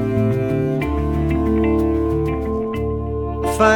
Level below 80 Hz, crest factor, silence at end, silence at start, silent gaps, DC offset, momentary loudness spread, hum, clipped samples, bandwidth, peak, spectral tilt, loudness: -28 dBFS; 18 dB; 0 s; 0 s; none; under 0.1%; 6 LU; none; under 0.1%; 17 kHz; 0 dBFS; -7.5 dB/octave; -20 LUFS